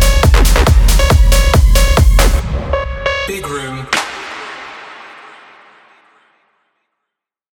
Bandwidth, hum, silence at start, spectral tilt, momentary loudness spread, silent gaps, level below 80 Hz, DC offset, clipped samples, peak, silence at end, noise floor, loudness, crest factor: 18.5 kHz; none; 0 s; -4.5 dB/octave; 18 LU; none; -14 dBFS; under 0.1%; under 0.1%; 0 dBFS; 2.45 s; -79 dBFS; -13 LUFS; 12 dB